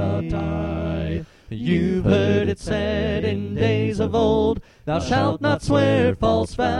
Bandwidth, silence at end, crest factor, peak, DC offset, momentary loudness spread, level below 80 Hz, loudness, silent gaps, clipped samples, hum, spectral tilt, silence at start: 11 kHz; 0 s; 16 dB; -4 dBFS; under 0.1%; 8 LU; -36 dBFS; -21 LUFS; none; under 0.1%; none; -7 dB/octave; 0 s